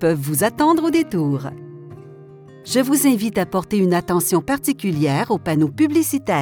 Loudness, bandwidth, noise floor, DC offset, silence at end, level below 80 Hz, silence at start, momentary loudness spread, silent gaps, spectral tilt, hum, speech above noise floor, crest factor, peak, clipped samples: -19 LUFS; over 20 kHz; -41 dBFS; under 0.1%; 0 s; -52 dBFS; 0 s; 13 LU; none; -5.5 dB/octave; none; 23 dB; 16 dB; -4 dBFS; under 0.1%